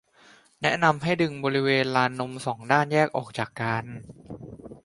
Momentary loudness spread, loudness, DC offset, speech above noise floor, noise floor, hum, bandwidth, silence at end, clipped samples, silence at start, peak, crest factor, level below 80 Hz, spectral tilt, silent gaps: 20 LU; -25 LUFS; under 0.1%; 31 dB; -56 dBFS; none; 11.5 kHz; 0.05 s; under 0.1%; 0.6 s; -4 dBFS; 22 dB; -60 dBFS; -5.5 dB/octave; none